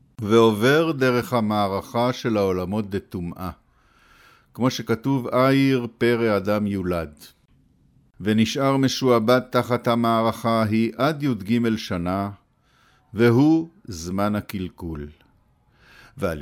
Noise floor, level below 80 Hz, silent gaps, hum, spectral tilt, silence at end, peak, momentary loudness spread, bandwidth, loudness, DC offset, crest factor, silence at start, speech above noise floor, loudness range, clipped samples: -60 dBFS; -52 dBFS; none; none; -6.5 dB/octave; 0 s; -4 dBFS; 14 LU; 17 kHz; -22 LUFS; under 0.1%; 18 dB; 0.2 s; 39 dB; 5 LU; under 0.1%